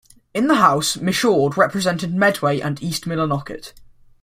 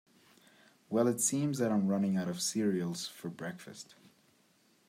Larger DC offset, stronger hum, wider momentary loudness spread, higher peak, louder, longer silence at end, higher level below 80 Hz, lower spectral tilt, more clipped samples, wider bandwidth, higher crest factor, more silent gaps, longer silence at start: neither; neither; second, 11 LU vs 17 LU; first, -2 dBFS vs -16 dBFS; first, -19 LUFS vs -33 LUFS; second, 0.4 s vs 1.05 s; first, -54 dBFS vs -80 dBFS; about the same, -4.5 dB/octave vs -4.5 dB/octave; neither; about the same, 16 kHz vs 16 kHz; about the same, 18 dB vs 18 dB; neither; second, 0.35 s vs 0.9 s